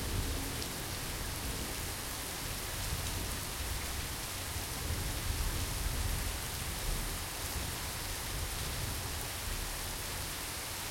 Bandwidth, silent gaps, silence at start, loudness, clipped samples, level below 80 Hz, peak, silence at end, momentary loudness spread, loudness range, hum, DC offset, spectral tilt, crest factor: 17 kHz; none; 0 s; -37 LUFS; under 0.1%; -42 dBFS; -18 dBFS; 0 s; 2 LU; 1 LU; none; under 0.1%; -2.5 dB/octave; 18 dB